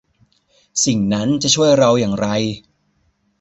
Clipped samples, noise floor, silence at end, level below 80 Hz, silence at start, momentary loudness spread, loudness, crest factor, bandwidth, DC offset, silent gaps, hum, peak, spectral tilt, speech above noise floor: under 0.1%; -63 dBFS; 0.8 s; -50 dBFS; 0.75 s; 12 LU; -16 LUFS; 16 dB; 8.2 kHz; under 0.1%; none; none; -2 dBFS; -4 dB/octave; 47 dB